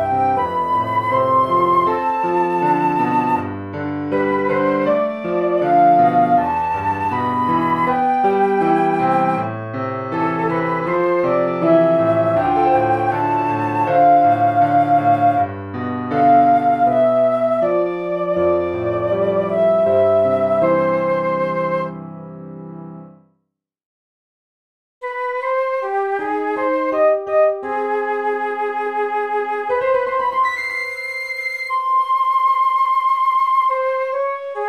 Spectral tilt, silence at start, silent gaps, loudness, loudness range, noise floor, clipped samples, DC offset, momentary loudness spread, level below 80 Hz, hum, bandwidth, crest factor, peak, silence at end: -8 dB/octave; 0 s; 23.86-25.01 s; -17 LUFS; 7 LU; -74 dBFS; under 0.1%; 0.1%; 8 LU; -56 dBFS; none; 12.5 kHz; 14 dB; -4 dBFS; 0 s